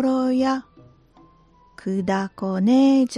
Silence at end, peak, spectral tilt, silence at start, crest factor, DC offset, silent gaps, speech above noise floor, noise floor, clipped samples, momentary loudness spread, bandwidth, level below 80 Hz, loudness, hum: 0 s; -8 dBFS; -6.5 dB/octave; 0 s; 14 dB; under 0.1%; none; 35 dB; -55 dBFS; under 0.1%; 12 LU; 10.5 kHz; -60 dBFS; -21 LUFS; none